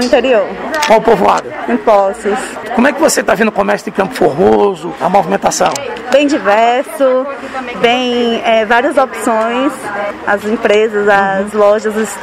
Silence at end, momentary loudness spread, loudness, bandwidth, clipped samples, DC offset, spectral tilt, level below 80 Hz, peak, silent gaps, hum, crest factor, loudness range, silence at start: 0 s; 7 LU; -12 LUFS; 16.5 kHz; 0.4%; under 0.1%; -4 dB/octave; -46 dBFS; 0 dBFS; none; none; 12 dB; 1 LU; 0 s